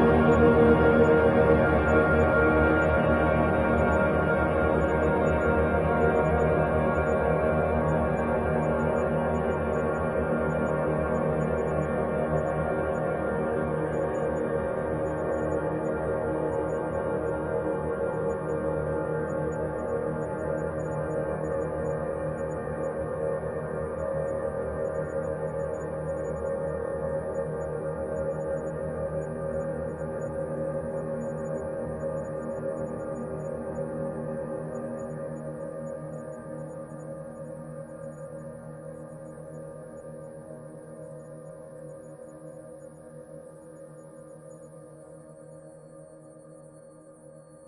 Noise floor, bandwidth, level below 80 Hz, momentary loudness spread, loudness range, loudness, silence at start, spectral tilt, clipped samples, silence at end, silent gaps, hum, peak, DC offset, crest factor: -50 dBFS; 11.5 kHz; -44 dBFS; 21 LU; 20 LU; -27 LUFS; 0 s; -8.5 dB/octave; under 0.1%; 0 s; none; none; -8 dBFS; under 0.1%; 20 dB